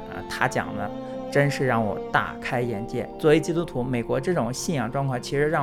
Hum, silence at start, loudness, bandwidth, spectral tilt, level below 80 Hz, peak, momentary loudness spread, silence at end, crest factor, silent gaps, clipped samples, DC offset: none; 0 s; -25 LUFS; 15 kHz; -5.5 dB/octave; -46 dBFS; -4 dBFS; 9 LU; 0 s; 20 dB; none; under 0.1%; under 0.1%